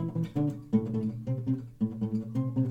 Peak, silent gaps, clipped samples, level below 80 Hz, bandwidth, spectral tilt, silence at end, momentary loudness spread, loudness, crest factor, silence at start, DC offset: -14 dBFS; none; under 0.1%; -60 dBFS; 8 kHz; -10.5 dB/octave; 0 s; 5 LU; -32 LUFS; 16 dB; 0 s; under 0.1%